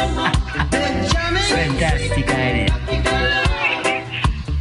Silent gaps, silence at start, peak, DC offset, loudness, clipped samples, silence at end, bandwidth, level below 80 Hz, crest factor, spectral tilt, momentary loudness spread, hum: none; 0 s; -4 dBFS; under 0.1%; -19 LUFS; under 0.1%; 0 s; 11.5 kHz; -24 dBFS; 14 dB; -4.5 dB/octave; 4 LU; none